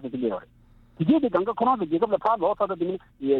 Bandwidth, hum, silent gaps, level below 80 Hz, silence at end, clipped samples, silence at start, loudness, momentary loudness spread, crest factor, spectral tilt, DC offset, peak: 4.9 kHz; none; none; -58 dBFS; 0 s; under 0.1%; 0 s; -25 LUFS; 8 LU; 16 dB; -10 dB/octave; under 0.1%; -8 dBFS